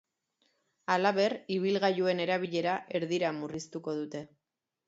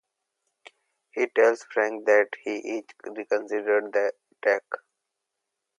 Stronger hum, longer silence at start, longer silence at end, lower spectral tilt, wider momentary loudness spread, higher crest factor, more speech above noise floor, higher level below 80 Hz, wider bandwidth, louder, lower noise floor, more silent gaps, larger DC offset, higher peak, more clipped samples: neither; second, 0.9 s vs 1.15 s; second, 0.6 s vs 1 s; first, -5.5 dB/octave vs -3.5 dB/octave; second, 11 LU vs 16 LU; about the same, 20 dB vs 20 dB; second, 45 dB vs 58 dB; first, -76 dBFS vs -86 dBFS; second, 8 kHz vs 9.8 kHz; second, -31 LUFS vs -25 LUFS; second, -76 dBFS vs -83 dBFS; neither; neither; second, -12 dBFS vs -8 dBFS; neither